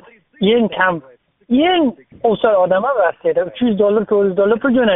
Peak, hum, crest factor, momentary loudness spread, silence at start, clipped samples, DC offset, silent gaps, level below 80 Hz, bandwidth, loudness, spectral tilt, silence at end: -2 dBFS; none; 14 dB; 5 LU; 0.4 s; under 0.1%; under 0.1%; none; -52 dBFS; 3.9 kHz; -16 LUFS; -3.5 dB/octave; 0 s